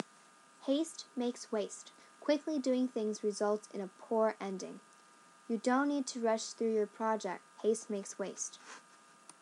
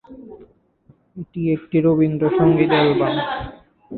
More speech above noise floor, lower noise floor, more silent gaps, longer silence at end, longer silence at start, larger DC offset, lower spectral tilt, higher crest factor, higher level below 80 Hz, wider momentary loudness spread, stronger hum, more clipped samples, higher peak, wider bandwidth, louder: second, 26 dB vs 38 dB; first, -62 dBFS vs -55 dBFS; neither; first, 0.6 s vs 0 s; about the same, 0 s vs 0.1 s; neither; second, -4 dB/octave vs -12 dB/octave; about the same, 18 dB vs 16 dB; second, under -90 dBFS vs -48 dBFS; second, 12 LU vs 16 LU; neither; neither; second, -18 dBFS vs -4 dBFS; first, 12 kHz vs 4.5 kHz; second, -36 LUFS vs -18 LUFS